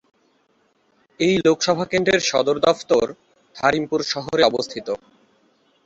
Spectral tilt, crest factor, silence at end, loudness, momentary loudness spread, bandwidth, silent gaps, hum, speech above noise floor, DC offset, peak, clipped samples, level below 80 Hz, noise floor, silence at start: -4 dB/octave; 20 dB; 0.9 s; -20 LUFS; 10 LU; 8 kHz; none; none; 44 dB; under 0.1%; -2 dBFS; under 0.1%; -56 dBFS; -63 dBFS; 1.2 s